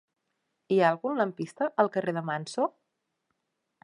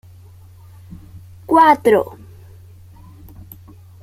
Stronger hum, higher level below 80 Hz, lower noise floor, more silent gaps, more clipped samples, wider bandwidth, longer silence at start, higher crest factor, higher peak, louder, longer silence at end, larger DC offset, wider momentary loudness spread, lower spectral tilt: neither; second, -84 dBFS vs -50 dBFS; first, -81 dBFS vs -42 dBFS; neither; neither; second, 11 kHz vs 16 kHz; second, 0.7 s vs 1.15 s; about the same, 22 dB vs 18 dB; second, -10 dBFS vs -2 dBFS; second, -28 LUFS vs -14 LUFS; second, 1.15 s vs 1.95 s; neither; second, 8 LU vs 28 LU; about the same, -6 dB/octave vs -6 dB/octave